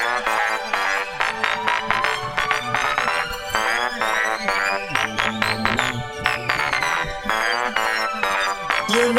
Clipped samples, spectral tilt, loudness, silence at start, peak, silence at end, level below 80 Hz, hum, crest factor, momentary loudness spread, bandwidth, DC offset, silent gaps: under 0.1%; -2.5 dB/octave; -21 LUFS; 0 s; 0 dBFS; 0 s; -46 dBFS; none; 22 dB; 3 LU; 17 kHz; under 0.1%; none